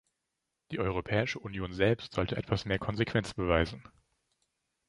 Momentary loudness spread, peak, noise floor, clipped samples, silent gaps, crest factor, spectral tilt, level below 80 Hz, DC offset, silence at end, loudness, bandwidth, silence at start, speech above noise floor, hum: 8 LU; -10 dBFS; -85 dBFS; under 0.1%; none; 24 dB; -6.5 dB/octave; -48 dBFS; under 0.1%; 1.1 s; -32 LUFS; 11.5 kHz; 0.7 s; 54 dB; none